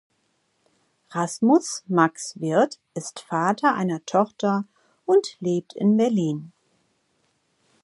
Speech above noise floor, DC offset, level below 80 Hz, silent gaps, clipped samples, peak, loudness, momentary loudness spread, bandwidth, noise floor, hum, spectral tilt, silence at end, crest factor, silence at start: 48 dB; under 0.1%; -76 dBFS; none; under 0.1%; -4 dBFS; -23 LUFS; 14 LU; 11.5 kHz; -70 dBFS; none; -5.5 dB/octave; 1.35 s; 20 dB; 1.1 s